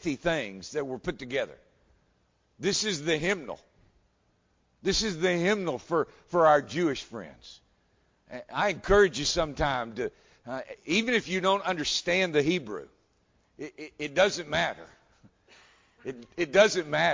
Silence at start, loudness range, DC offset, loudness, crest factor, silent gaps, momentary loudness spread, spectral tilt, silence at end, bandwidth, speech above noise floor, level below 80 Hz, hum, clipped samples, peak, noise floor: 0.05 s; 5 LU; under 0.1%; -27 LUFS; 22 dB; none; 19 LU; -3.5 dB/octave; 0 s; 7.6 kHz; 42 dB; -52 dBFS; none; under 0.1%; -8 dBFS; -70 dBFS